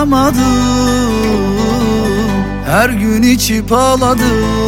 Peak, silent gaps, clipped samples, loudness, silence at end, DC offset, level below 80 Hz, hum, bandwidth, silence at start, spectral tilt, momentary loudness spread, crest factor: 0 dBFS; none; under 0.1%; -12 LUFS; 0 s; under 0.1%; -24 dBFS; none; 17 kHz; 0 s; -5 dB/octave; 4 LU; 12 dB